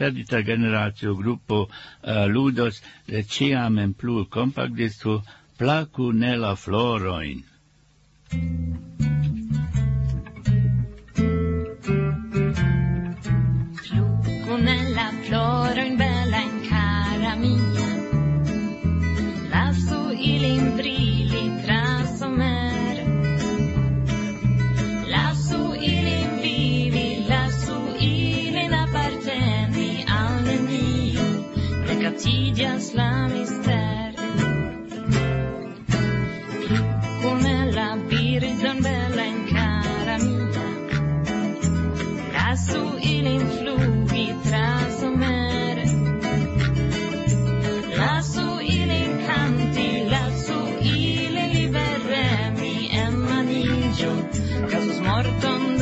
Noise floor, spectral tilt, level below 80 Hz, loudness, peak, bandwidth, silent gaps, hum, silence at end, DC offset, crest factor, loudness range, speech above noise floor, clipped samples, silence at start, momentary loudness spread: -58 dBFS; -6 dB/octave; -36 dBFS; -23 LUFS; -8 dBFS; 8.2 kHz; none; none; 0 s; under 0.1%; 14 dB; 2 LU; 34 dB; under 0.1%; 0 s; 5 LU